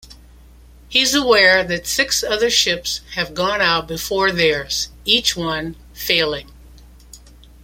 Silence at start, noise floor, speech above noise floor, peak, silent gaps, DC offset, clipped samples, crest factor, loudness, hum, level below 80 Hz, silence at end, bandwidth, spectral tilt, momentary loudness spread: 0.1 s; -44 dBFS; 26 dB; 0 dBFS; none; under 0.1%; under 0.1%; 18 dB; -17 LUFS; none; -42 dBFS; 0.45 s; 16.5 kHz; -2 dB/octave; 11 LU